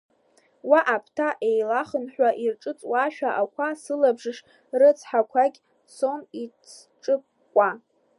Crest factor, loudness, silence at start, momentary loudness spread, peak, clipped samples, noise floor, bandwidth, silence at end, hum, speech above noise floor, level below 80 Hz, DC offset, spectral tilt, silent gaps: 20 dB; -24 LUFS; 0.65 s; 16 LU; -4 dBFS; under 0.1%; -63 dBFS; 11.5 kHz; 0.4 s; none; 39 dB; -84 dBFS; under 0.1%; -4.5 dB/octave; none